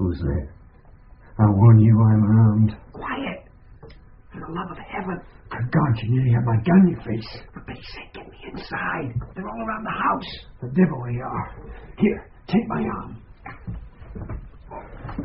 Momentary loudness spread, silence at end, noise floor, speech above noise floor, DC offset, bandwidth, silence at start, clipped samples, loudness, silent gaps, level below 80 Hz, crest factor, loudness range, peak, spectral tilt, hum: 23 LU; 0 s; -48 dBFS; 27 dB; under 0.1%; 5.6 kHz; 0 s; under 0.1%; -21 LUFS; none; -42 dBFS; 18 dB; 10 LU; -4 dBFS; -8 dB/octave; none